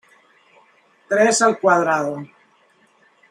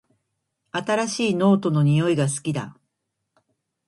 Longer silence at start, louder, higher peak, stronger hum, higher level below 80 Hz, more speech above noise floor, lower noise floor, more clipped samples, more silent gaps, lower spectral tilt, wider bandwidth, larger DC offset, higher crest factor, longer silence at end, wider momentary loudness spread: first, 1.1 s vs 0.75 s; first, -17 LUFS vs -22 LUFS; first, -2 dBFS vs -6 dBFS; neither; second, -74 dBFS vs -64 dBFS; second, 41 dB vs 58 dB; second, -58 dBFS vs -79 dBFS; neither; neither; second, -3.5 dB/octave vs -6 dB/octave; first, 15.5 kHz vs 11.5 kHz; neither; about the same, 20 dB vs 18 dB; about the same, 1.05 s vs 1.15 s; first, 16 LU vs 12 LU